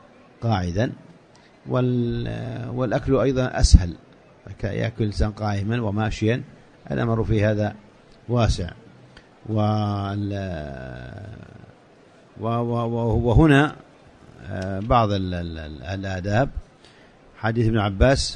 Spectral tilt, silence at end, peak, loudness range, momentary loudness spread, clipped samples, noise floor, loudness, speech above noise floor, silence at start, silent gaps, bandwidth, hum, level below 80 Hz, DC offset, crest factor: -6.5 dB/octave; 0 s; 0 dBFS; 6 LU; 17 LU; under 0.1%; -52 dBFS; -23 LUFS; 30 dB; 0.4 s; none; 10 kHz; none; -30 dBFS; under 0.1%; 22 dB